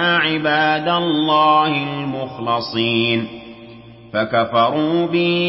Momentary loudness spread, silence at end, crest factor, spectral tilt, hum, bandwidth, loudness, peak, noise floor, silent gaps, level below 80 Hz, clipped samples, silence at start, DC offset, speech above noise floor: 11 LU; 0 s; 14 dB; -10 dB/octave; none; 5.8 kHz; -17 LUFS; -4 dBFS; -39 dBFS; none; -56 dBFS; under 0.1%; 0 s; under 0.1%; 22 dB